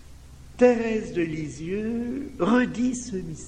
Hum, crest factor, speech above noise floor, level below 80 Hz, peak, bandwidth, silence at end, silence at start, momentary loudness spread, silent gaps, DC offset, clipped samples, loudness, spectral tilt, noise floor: none; 20 dB; 20 dB; -48 dBFS; -6 dBFS; 10 kHz; 0 s; 0.05 s; 11 LU; none; under 0.1%; under 0.1%; -25 LUFS; -6 dB/octave; -45 dBFS